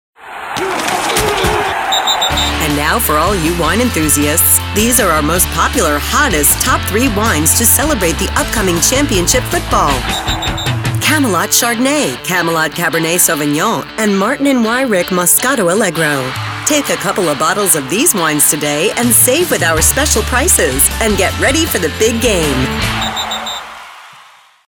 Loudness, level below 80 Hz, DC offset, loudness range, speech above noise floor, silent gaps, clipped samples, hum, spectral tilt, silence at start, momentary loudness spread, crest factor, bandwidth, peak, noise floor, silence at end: -12 LUFS; -28 dBFS; under 0.1%; 3 LU; 30 dB; none; under 0.1%; none; -3 dB/octave; 0.2 s; 7 LU; 12 dB; over 20 kHz; 0 dBFS; -42 dBFS; 0.5 s